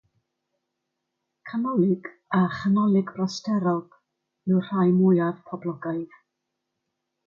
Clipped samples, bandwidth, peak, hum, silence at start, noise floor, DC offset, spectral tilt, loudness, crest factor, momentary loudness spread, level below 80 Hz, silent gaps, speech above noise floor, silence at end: under 0.1%; 7.2 kHz; -10 dBFS; none; 1.45 s; -81 dBFS; under 0.1%; -8 dB/octave; -24 LUFS; 16 dB; 13 LU; -68 dBFS; none; 58 dB; 1.2 s